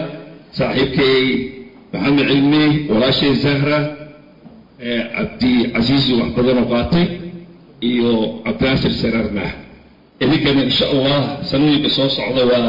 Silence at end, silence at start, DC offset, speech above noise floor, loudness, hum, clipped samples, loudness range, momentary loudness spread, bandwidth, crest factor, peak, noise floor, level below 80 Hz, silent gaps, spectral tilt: 0 s; 0 s; 0.4%; 29 dB; -16 LUFS; none; under 0.1%; 3 LU; 11 LU; 5.4 kHz; 10 dB; -6 dBFS; -45 dBFS; -40 dBFS; none; -7.5 dB/octave